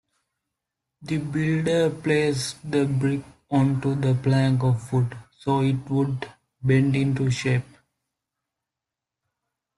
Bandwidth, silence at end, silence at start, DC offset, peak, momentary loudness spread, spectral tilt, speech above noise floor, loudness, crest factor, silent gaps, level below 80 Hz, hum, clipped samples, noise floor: 11.5 kHz; 2.15 s; 1 s; under 0.1%; -8 dBFS; 9 LU; -7 dB/octave; 65 dB; -24 LUFS; 16 dB; none; -58 dBFS; none; under 0.1%; -87 dBFS